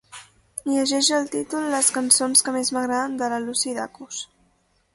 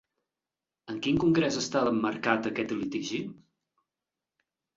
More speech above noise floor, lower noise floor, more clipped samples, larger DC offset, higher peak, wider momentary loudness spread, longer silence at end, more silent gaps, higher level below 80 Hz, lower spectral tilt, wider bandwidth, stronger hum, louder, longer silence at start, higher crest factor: second, 42 dB vs over 62 dB; second, -65 dBFS vs under -90 dBFS; neither; neither; first, -2 dBFS vs -10 dBFS; first, 17 LU vs 10 LU; second, 0.7 s vs 1.4 s; neither; about the same, -66 dBFS vs -62 dBFS; second, -0.5 dB/octave vs -5 dB/octave; first, 12 kHz vs 7.8 kHz; neither; first, -21 LUFS vs -28 LUFS; second, 0.15 s vs 0.85 s; about the same, 22 dB vs 22 dB